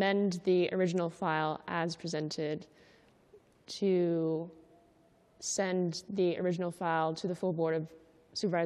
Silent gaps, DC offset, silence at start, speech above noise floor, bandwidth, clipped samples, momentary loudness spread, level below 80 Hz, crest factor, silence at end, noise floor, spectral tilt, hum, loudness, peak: none; under 0.1%; 0 s; 33 dB; 12 kHz; under 0.1%; 9 LU; -76 dBFS; 14 dB; 0 s; -65 dBFS; -5.5 dB/octave; none; -33 LUFS; -18 dBFS